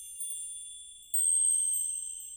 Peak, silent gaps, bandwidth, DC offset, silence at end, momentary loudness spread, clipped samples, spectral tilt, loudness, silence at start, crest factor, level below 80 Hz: -18 dBFS; none; over 20 kHz; under 0.1%; 0 s; 18 LU; under 0.1%; 5 dB/octave; -27 LUFS; 0 s; 14 dB; -72 dBFS